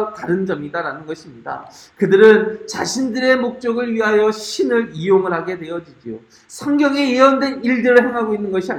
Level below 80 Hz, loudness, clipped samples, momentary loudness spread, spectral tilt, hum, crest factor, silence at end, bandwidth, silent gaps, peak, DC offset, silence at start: -60 dBFS; -16 LUFS; under 0.1%; 17 LU; -5 dB/octave; none; 16 dB; 0 s; 13.5 kHz; none; 0 dBFS; under 0.1%; 0 s